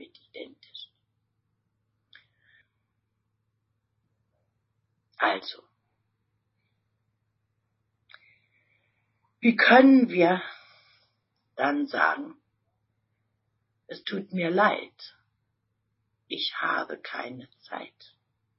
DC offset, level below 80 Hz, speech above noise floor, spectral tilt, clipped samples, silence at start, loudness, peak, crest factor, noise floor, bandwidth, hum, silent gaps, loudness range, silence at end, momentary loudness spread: under 0.1%; -80 dBFS; 54 dB; -8.5 dB/octave; under 0.1%; 0 s; -24 LUFS; -4 dBFS; 24 dB; -78 dBFS; 5.8 kHz; none; none; 13 LU; 0.7 s; 27 LU